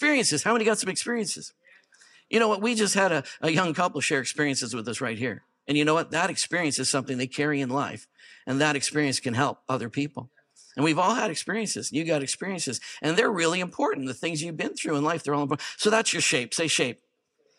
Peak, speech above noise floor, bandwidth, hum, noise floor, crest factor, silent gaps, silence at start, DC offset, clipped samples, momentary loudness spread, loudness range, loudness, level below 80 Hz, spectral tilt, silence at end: -6 dBFS; 44 dB; 14.5 kHz; none; -70 dBFS; 20 dB; none; 0 s; under 0.1%; under 0.1%; 8 LU; 2 LU; -26 LUFS; -76 dBFS; -3.5 dB/octave; 0.65 s